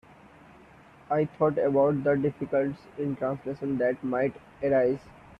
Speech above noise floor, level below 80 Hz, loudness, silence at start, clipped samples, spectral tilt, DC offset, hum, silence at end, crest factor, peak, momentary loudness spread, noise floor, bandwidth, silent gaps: 27 dB; -62 dBFS; -28 LUFS; 1.1 s; under 0.1%; -9.5 dB/octave; under 0.1%; none; 0.3 s; 16 dB; -12 dBFS; 9 LU; -53 dBFS; 6 kHz; none